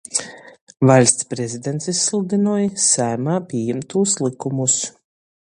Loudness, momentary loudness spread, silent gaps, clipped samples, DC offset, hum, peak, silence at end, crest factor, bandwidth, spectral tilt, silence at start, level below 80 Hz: -18 LUFS; 11 LU; 0.61-0.67 s; under 0.1%; under 0.1%; none; 0 dBFS; 0.7 s; 20 dB; 11 kHz; -4 dB/octave; 0.1 s; -60 dBFS